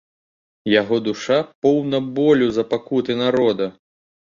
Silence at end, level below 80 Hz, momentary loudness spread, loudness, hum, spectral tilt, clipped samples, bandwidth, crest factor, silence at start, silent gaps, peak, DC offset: 0.5 s; -58 dBFS; 6 LU; -19 LUFS; none; -6 dB/octave; under 0.1%; 7.4 kHz; 16 dB; 0.65 s; 1.55-1.62 s; -4 dBFS; under 0.1%